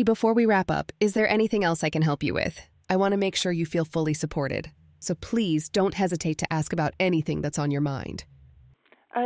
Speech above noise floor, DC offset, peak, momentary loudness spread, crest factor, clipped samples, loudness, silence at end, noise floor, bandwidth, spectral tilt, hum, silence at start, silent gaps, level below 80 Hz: 33 dB; under 0.1%; -8 dBFS; 10 LU; 18 dB; under 0.1%; -26 LUFS; 0 s; -58 dBFS; 8 kHz; -5.5 dB/octave; none; 0 s; none; -52 dBFS